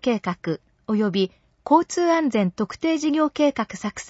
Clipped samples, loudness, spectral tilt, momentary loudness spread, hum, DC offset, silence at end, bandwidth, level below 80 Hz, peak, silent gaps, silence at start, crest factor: under 0.1%; -23 LUFS; -5.5 dB/octave; 9 LU; none; under 0.1%; 0 s; 8 kHz; -60 dBFS; -4 dBFS; none; 0 s; 18 dB